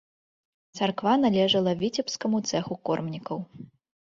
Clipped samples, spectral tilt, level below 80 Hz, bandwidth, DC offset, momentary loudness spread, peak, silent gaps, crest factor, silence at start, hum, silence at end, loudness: under 0.1%; -5 dB/octave; -66 dBFS; 7.6 kHz; under 0.1%; 14 LU; -10 dBFS; none; 18 dB; 0.75 s; none; 0.5 s; -26 LUFS